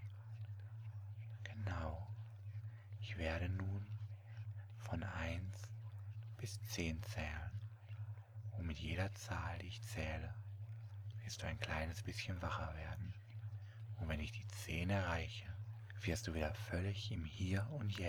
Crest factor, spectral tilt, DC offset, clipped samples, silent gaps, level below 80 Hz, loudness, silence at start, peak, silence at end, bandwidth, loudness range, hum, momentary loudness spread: 22 dB; -5.5 dB/octave; under 0.1%; under 0.1%; none; -56 dBFS; -46 LUFS; 0 s; -22 dBFS; 0 s; 19 kHz; 4 LU; none; 10 LU